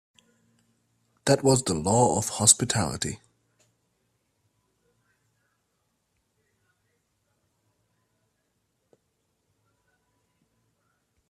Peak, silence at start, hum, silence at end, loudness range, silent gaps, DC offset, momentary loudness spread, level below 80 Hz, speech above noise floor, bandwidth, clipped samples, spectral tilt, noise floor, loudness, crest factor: -2 dBFS; 1.25 s; none; 8.15 s; 11 LU; none; under 0.1%; 13 LU; -60 dBFS; 52 dB; 14.5 kHz; under 0.1%; -3.5 dB/octave; -75 dBFS; -23 LUFS; 28 dB